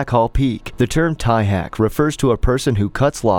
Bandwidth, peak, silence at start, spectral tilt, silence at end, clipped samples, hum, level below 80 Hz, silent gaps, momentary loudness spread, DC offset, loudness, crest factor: 18 kHz; -2 dBFS; 0 s; -6.5 dB/octave; 0 s; under 0.1%; none; -28 dBFS; none; 3 LU; under 0.1%; -18 LUFS; 14 dB